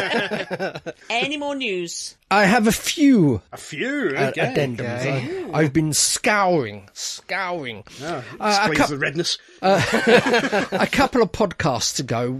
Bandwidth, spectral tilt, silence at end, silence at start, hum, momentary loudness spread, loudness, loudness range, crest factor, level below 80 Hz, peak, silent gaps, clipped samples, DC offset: 14 kHz; -4 dB/octave; 0 s; 0 s; none; 13 LU; -20 LUFS; 3 LU; 20 dB; -48 dBFS; -2 dBFS; none; under 0.1%; under 0.1%